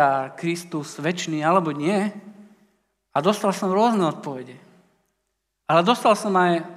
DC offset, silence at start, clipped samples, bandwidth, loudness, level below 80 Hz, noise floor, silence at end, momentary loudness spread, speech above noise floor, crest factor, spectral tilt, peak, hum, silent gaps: under 0.1%; 0 s; under 0.1%; 15.5 kHz; -22 LUFS; -78 dBFS; -77 dBFS; 0 s; 14 LU; 55 dB; 18 dB; -5.5 dB/octave; -4 dBFS; none; none